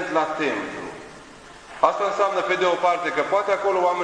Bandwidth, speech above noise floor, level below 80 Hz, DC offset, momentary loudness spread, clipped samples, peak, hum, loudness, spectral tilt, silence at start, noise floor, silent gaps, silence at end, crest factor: 10.5 kHz; 22 dB; -60 dBFS; under 0.1%; 18 LU; under 0.1%; -2 dBFS; none; -22 LUFS; -4 dB/octave; 0 s; -44 dBFS; none; 0 s; 20 dB